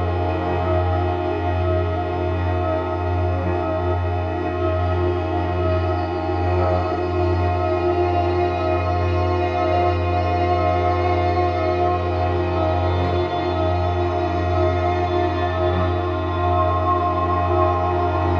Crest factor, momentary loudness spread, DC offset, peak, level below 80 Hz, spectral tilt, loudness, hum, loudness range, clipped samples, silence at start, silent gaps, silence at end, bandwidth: 16 dB; 3 LU; under 0.1%; -4 dBFS; -34 dBFS; -8.5 dB/octave; -21 LUFS; none; 2 LU; under 0.1%; 0 s; none; 0 s; 6.4 kHz